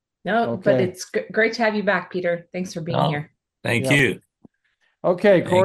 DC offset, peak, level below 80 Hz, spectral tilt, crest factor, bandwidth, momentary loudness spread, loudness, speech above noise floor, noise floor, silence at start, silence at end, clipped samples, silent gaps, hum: under 0.1%; -4 dBFS; -58 dBFS; -5.5 dB/octave; 18 dB; 12.5 kHz; 12 LU; -21 LUFS; 47 dB; -68 dBFS; 0.25 s; 0 s; under 0.1%; none; none